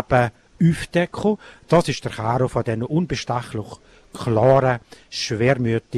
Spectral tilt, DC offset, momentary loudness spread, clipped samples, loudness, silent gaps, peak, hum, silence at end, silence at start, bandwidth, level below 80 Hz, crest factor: -6.5 dB/octave; under 0.1%; 12 LU; under 0.1%; -21 LUFS; none; -4 dBFS; none; 0 s; 0 s; 13 kHz; -46 dBFS; 16 dB